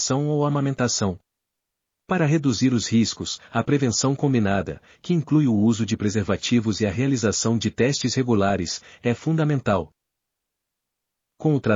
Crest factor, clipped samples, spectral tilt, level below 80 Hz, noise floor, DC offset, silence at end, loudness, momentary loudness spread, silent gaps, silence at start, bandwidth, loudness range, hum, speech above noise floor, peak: 16 dB; under 0.1%; -5.5 dB/octave; -56 dBFS; -82 dBFS; under 0.1%; 0 s; -22 LUFS; 7 LU; none; 0 s; 7.6 kHz; 3 LU; none; 61 dB; -6 dBFS